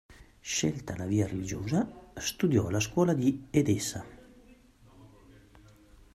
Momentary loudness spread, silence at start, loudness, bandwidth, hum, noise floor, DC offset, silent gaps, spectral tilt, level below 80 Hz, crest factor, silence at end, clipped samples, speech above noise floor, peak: 10 LU; 0.45 s; -30 LUFS; 14.5 kHz; none; -57 dBFS; under 0.1%; none; -5.5 dB/octave; -56 dBFS; 20 dB; 1.1 s; under 0.1%; 28 dB; -12 dBFS